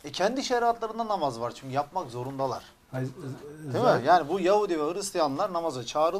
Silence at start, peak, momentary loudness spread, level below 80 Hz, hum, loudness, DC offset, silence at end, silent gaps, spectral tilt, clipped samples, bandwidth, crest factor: 0.05 s; -10 dBFS; 13 LU; -62 dBFS; none; -28 LUFS; under 0.1%; 0 s; none; -5 dB/octave; under 0.1%; 15.5 kHz; 18 dB